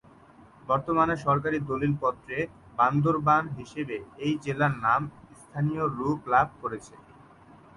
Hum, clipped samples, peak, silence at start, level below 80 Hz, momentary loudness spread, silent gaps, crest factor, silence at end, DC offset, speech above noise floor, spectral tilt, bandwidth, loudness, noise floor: none; under 0.1%; -10 dBFS; 0.65 s; -56 dBFS; 12 LU; none; 18 dB; 0.8 s; under 0.1%; 27 dB; -7.5 dB/octave; 11.5 kHz; -27 LUFS; -54 dBFS